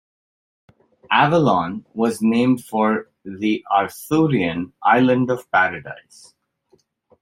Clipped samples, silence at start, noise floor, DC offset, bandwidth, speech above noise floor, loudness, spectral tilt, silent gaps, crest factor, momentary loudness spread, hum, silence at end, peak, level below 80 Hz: under 0.1%; 1.1 s; -61 dBFS; under 0.1%; 16 kHz; 42 dB; -19 LUFS; -6 dB/octave; none; 18 dB; 10 LU; none; 1.25 s; -2 dBFS; -60 dBFS